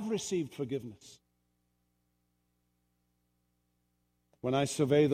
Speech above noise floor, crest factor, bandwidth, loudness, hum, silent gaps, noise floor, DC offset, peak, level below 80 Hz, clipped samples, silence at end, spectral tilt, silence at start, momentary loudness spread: 47 dB; 20 dB; 15.5 kHz; -33 LUFS; 60 Hz at -75 dBFS; none; -78 dBFS; under 0.1%; -14 dBFS; -72 dBFS; under 0.1%; 0 s; -5.5 dB/octave; 0 s; 12 LU